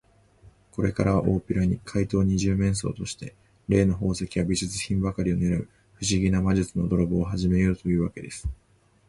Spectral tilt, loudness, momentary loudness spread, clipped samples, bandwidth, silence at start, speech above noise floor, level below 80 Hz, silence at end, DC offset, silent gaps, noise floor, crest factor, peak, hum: -6 dB/octave; -25 LUFS; 12 LU; under 0.1%; 11.5 kHz; 0.45 s; 31 dB; -40 dBFS; 0.55 s; under 0.1%; none; -55 dBFS; 20 dB; -6 dBFS; none